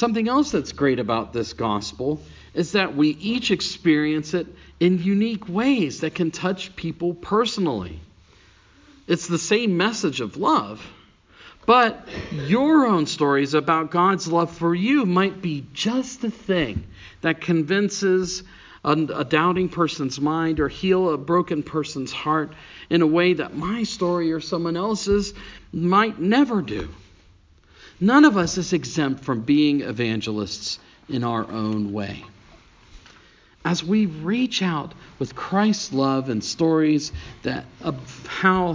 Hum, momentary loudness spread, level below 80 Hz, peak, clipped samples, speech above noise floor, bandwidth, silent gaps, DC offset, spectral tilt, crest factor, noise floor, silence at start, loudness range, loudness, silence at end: none; 12 LU; -48 dBFS; -2 dBFS; under 0.1%; 32 dB; 7.6 kHz; none; under 0.1%; -5.5 dB/octave; 20 dB; -54 dBFS; 0 s; 5 LU; -22 LUFS; 0 s